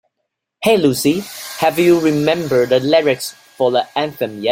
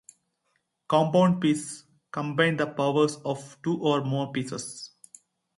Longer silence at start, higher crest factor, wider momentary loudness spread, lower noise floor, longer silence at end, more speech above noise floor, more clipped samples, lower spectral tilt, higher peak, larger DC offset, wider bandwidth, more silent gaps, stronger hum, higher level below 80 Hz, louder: second, 0.6 s vs 0.9 s; second, 14 dB vs 20 dB; second, 9 LU vs 16 LU; about the same, -75 dBFS vs -75 dBFS; second, 0 s vs 0.7 s; first, 60 dB vs 50 dB; neither; about the same, -5 dB/octave vs -5.5 dB/octave; first, -2 dBFS vs -8 dBFS; neither; first, 16.5 kHz vs 11.5 kHz; neither; neither; first, -56 dBFS vs -70 dBFS; first, -16 LUFS vs -26 LUFS